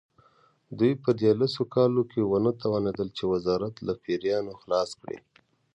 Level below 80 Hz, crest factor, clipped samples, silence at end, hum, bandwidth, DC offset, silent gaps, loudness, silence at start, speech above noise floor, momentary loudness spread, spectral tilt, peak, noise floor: -60 dBFS; 18 dB; under 0.1%; 0.55 s; none; 9.8 kHz; under 0.1%; none; -27 LUFS; 0.7 s; 37 dB; 10 LU; -7.5 dB/octave; -10 dBFS; -63 dBFS